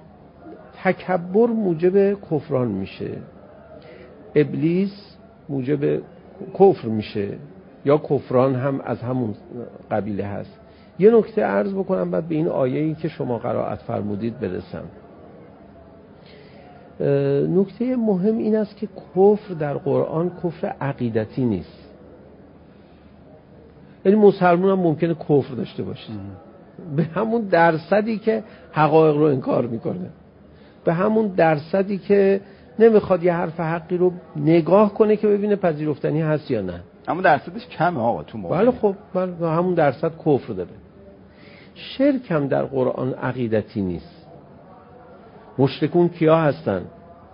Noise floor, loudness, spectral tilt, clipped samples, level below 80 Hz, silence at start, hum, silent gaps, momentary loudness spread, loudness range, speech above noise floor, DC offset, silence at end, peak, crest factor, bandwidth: -47 dBFS; -21 LUFS; -12.5 dB/octave; under 0.1%; -54 dBFS; 0.4 s; none; none; 14 LU; 6 LU; 27 dB; under 0.1%; 0.35 s; -2 dBFS; 20 dB; 5.4 kHz